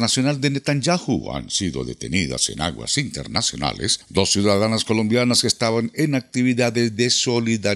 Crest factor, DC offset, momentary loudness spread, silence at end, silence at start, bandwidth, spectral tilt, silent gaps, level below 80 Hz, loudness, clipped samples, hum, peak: 20 dB; under 0.1%; 7 LU; 0 s; 0 s; 14 kHz; -4 dB/octave; none; -48 dBFS; -20 LUFS; under 0.1%; none; -2 dBFS